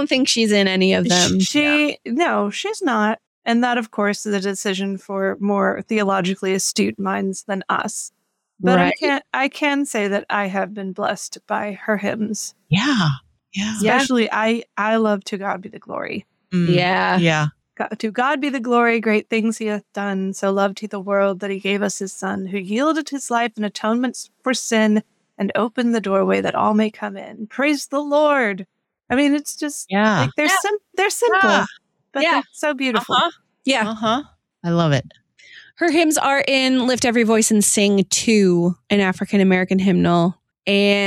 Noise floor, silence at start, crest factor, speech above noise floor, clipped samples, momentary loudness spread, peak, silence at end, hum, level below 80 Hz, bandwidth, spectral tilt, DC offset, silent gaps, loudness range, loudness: -46 dBFS; 0 s; 16 dB; 27 dB; under 0.1%; 10 LU; -4 dBFS; 0 s; none; -60 dBFS; 16 kHz; -4 dB/octave; under 0.1%; 3.27-3.42 s; 5 LU; -19 LUFS